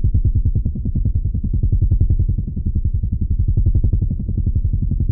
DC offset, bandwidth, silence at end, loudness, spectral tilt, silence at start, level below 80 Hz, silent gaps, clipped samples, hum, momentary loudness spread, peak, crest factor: under 0.1%; 0.8 kHz; 0 s; -20 LUFS; -17 dB/octave; 0 s; -20 dBFS; none; under 0.1%; none; 4 LU; -4 dBFS; 12 dB